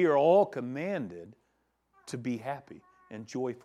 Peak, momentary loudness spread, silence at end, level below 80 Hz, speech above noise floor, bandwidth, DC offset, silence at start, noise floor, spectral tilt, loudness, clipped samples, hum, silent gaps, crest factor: -12 dBFS; 21 LU; 0.1 s; -78 dBFS; 46 dB; 12 kHz; under 0.1%; 0 s; -75 dBFS; -6.5 dB/octave; -30 LUFS; under 0.1%; none; none; 20 dB